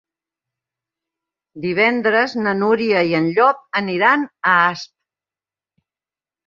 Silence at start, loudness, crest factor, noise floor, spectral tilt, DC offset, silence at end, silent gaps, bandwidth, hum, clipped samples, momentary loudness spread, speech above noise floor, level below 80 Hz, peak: 1.55 s; -17 LUFS; 18 dB; under -90 dBFS; -6 dB/octave; under 0.1%; 1.6 s; none; 7.4 kHz; none; under 0.1%; 7 LU; over 73 dB; -64 dBFS; -2 dBFS